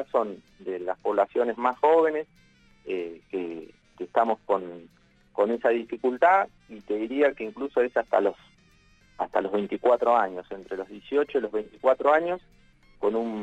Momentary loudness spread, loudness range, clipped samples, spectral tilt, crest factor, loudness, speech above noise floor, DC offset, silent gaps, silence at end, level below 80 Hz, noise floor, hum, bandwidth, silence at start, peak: 15 LU; 3 LU; under 0.1%; -6.5 dB/octave; 18 dB; -26 LUFS; 34 dB; under 0.1%; none; 0 s; -64 dBFS; -59 dBFS; none; 8 kHz; 0 s; -8 dBFS